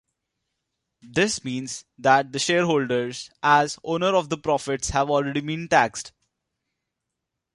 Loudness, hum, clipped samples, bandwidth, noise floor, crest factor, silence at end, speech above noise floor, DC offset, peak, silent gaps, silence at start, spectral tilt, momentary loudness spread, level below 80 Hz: -23 LUFS; none; under 0.1%; 11.5 kHz; -83 dBFS; 22 dB; 1.45 s; 60 dB; under 0.1%; -2 dBFS; none; 1.05 s; -4 dB/octave; 10 LU; -50 dBFS